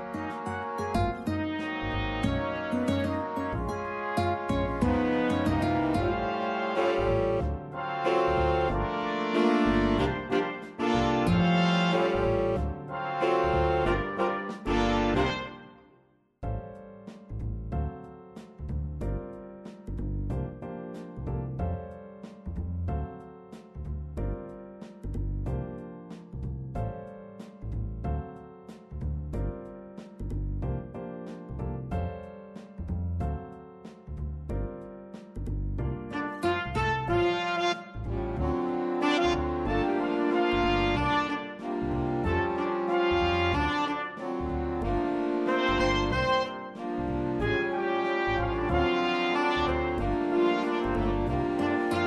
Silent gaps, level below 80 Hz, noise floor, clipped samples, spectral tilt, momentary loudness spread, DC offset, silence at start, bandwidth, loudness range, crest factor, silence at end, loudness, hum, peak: none; -40 dBFS; -64 dBFS; under 0.1%; -7 dB/octave; 17 LU; under 0.1%; 0 s; 12 kHz; 11 LU; 16 dB; 0 s; -29 LUFS; none; -12 dBFS